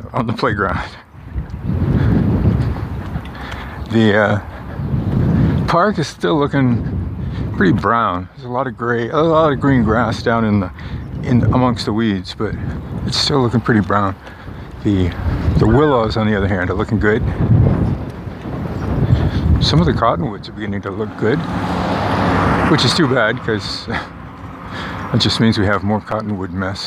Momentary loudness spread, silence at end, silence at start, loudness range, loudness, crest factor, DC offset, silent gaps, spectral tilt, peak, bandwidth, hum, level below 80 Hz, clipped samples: 13 LU; 0 s; 0 s; 2 LU; -17 LUFS; 16 dB; under 0.1%; none; -6.5 dB/octave; 0 dBFS; 11 kHz; none; -28 dBFS; under 0.1%